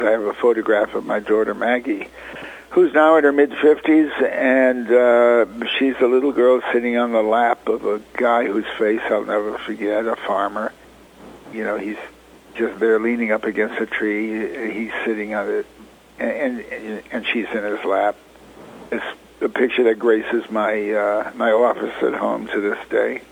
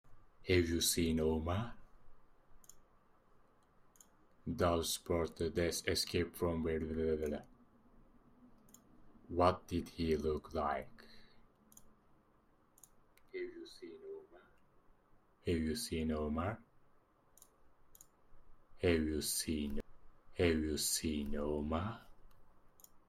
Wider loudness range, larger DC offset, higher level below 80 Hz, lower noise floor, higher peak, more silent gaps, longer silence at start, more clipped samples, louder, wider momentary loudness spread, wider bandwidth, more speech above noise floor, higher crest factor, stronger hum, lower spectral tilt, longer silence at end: second, 9 LU vs 13 LU; neither; about the same, -58 dBFS vs -56 dBFS; second, -44 dBFS vs -70 dBFS; first, -2 dBFS vs -16 dBFS; neither; about the same, 0 s vs 0.05 s; neither; first, -19 LUFS vs -37 LUFS; second, 12 LU vs 17 LU; second, 10.5 kHz vs 16 kHz; second, 25 dB vs 34 dB; second, 18 dB vs 24 dB; neither; about the same, -5.5 dB/octave vs -4.5 dB/octave; about the same, 0.05 s vs 0.1 s